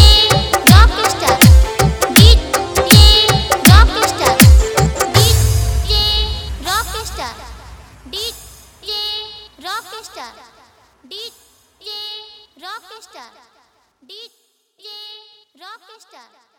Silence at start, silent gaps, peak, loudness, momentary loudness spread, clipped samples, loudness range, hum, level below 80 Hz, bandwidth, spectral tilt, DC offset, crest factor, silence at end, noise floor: 0 s; none; 0 dBFS; -11 LUFS; 24 LU; 0.4%; 23 LU; none; -18 dBFS; over 20 kHz; -4 dB/octave; under 0.1%; 14 dB; 0.85 s; -60 dBFS